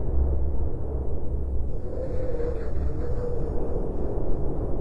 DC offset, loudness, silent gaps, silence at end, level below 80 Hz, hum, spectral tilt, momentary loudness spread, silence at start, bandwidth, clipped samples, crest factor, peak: under 0.1%; -31 LUFS; none; 0 s; -28 dBFS; none; -10.5 dB/octave; 4 LU; 0 s; 2.2 kHz; under 0.1%; 12 dB; -12 dBFS